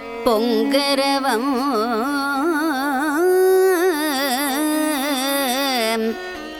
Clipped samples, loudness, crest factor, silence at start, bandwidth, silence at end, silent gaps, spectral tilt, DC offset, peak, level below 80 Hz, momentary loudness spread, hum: under 0.1%; -19 LUFS; 16 dB; 0 s; 20 kHz; 0 s; none; -2.5 dB/octave; under 0.1%; -4 dBFS; -54 dBFS; 5 LU; none